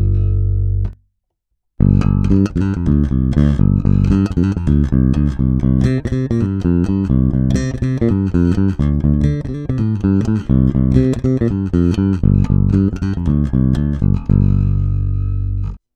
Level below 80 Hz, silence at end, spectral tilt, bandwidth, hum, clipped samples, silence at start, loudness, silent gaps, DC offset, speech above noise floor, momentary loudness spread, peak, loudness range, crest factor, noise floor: -22 dBFS; 0.2 s; -9.5 dB/octave; 8.4 kHz; none; under 0.1%; 0 s; -16 LUFS; none; under 0.1%; 58 dB; 5 LU; 0 dBFS; 1 LU; 14 dB; -72 dBFS